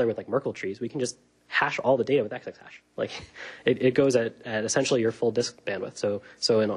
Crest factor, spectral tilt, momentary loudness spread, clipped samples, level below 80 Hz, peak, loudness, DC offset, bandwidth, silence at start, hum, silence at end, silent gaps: 18 dB; -4.5 dB/octave; 11 LU; under 0.1%; -66 dBFS; -8 dBFS; -27 LUFS; under 0.1%; 11.5 kHz; 0 s; none; 0 s; none